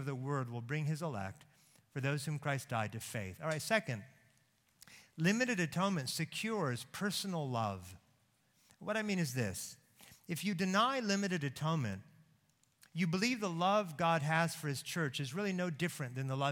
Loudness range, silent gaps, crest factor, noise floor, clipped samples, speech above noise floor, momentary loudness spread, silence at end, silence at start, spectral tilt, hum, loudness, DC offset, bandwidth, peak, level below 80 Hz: 4 LU; none; 22 dB; -74 dBFS; under 0.1%; 37 dB; 12 LU; 0 s; 0 s; -5 dB/octave; none; -36 LUFS; under 0.1%; 17.5 kHz; -16 dBFS; -76 dBFS